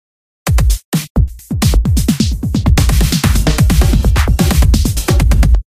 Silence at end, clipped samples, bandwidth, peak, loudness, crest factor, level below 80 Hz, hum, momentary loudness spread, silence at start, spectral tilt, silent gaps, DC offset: 0.05 s; under 0.1%; 16 kHz; 0 dBFS; -13 LUFS; 10 dB; -14 dBFS; none; 6 LU; 0.45 s; -5.5 dB/octave; 0.85-0.92 s, 1.10-1.15 s; under 0.1%